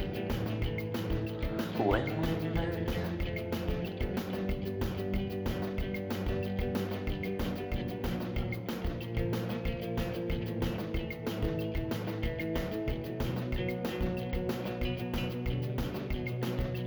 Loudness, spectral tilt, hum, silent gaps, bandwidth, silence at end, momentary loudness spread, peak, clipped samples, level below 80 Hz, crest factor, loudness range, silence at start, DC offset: -35 LUFS; -7 dB/octave; none; none; over 20 kHz; 0 s; 3 LU; -14 dBFS; under 0.1%; -40 dBFS; 20 dB; 2 LU; 0 s; under 0.1%